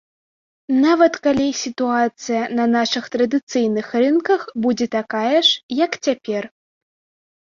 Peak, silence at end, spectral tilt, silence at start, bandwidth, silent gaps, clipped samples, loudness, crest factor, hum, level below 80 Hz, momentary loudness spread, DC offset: -2 dBFS; 1.1 s; -3.5 dB/octave; 0.7 s; 7.4 kHz; 3.43-3.47 s, 5.63-5.69 s; under 0.1%; -19 LUFS; 18 dB; none; -60 dBFS; 7 LU; under 0.1%